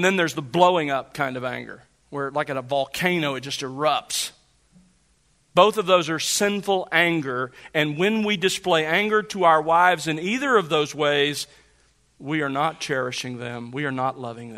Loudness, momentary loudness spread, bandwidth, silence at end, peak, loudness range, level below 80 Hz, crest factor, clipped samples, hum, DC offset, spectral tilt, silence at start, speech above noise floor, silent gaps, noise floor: -22 LUFS; 12 LU; 16 kHz; 0 s; -2 dBFS; 6 LU; -64 dBFS; 22 dB; under 0.1%; none; under 0.1%; -3.5 dB/octave; 0 s; 41 dB; none; -63 dBFS